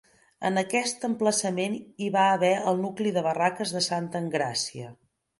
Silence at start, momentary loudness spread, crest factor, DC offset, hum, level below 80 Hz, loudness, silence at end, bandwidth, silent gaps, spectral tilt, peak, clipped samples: 0.4 s; 9 LU; 18 dB; under 0.1%; none; -72 dBFS; -26 LUFS; 0.45 s; 11.5 kHz; none; -4 dB/octave; -8 dBFS; under 0.1%